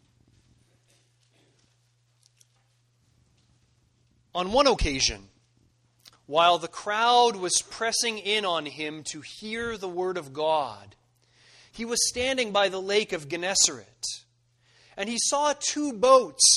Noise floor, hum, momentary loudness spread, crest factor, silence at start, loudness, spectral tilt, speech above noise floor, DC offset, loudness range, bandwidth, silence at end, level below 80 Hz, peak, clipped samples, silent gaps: -67 dBFS; none; 15 LU; 24 dB; 4.35 s; -25 LUFS; -1.5 dB/octave; 42 dB; under 0.1%; 6 LU; 13 kHz; 0 s; -48 dBFS; -4 dBFS; under 0.1%; none